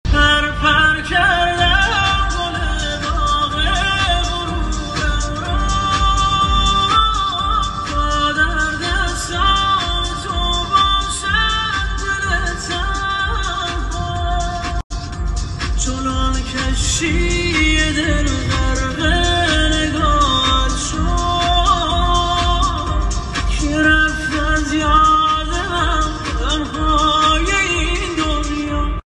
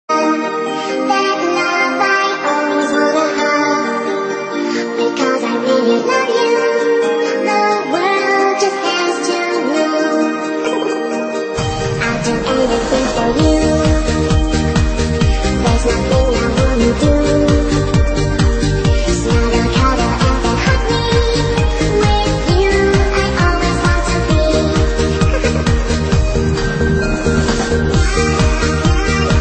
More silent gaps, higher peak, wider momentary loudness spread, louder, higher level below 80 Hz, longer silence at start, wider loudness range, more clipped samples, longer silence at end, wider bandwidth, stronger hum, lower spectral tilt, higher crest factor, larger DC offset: first, 14.84-14.90 s vs none; about the same, -2 dBFS vs 0 dBFS; first, 8 LU vs 4 LU; about the same, -16 LUFS vs -15 LUFS; about the same, -22 dBFS vs -20 dBFS; about the same, 0.05 s vs 0.1 s; about the same, 4 LU vs 2 LU; neither; about the same, 0.1 s vs 0 s; first, 11 kHz vs 8.8 kHz; neither; second, -3.5 dB/octave vs -5.5 dB/octave; about the same, 16 dB vs 12 dB; neither